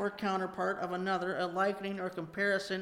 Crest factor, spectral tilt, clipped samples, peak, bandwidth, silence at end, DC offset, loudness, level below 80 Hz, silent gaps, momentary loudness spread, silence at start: 16 dB; -5.5 dB/octave; under 0.1%; -18 dBFS; 16 kHz; 0 s; under 0.1%; -34 LUFS; -72 dBFS; none; 6 LU; 0 s